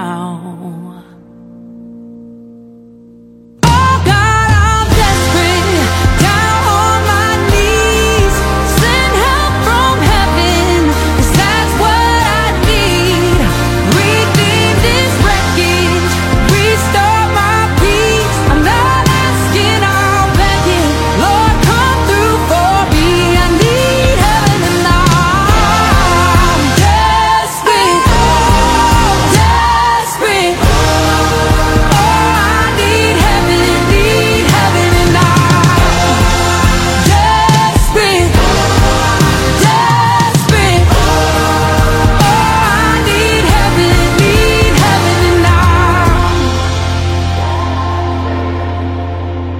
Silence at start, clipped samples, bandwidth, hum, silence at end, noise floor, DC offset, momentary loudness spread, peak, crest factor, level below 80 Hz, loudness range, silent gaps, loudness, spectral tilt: 0 s; 0.1%; 17 kHz; none; 0 s; -38 dBFS; under 0.1%; 3 LU; 0 dBFS; 10 dB; -18 dBFS; 2 LU; none; -10 LUFS; -4.5 dB/octave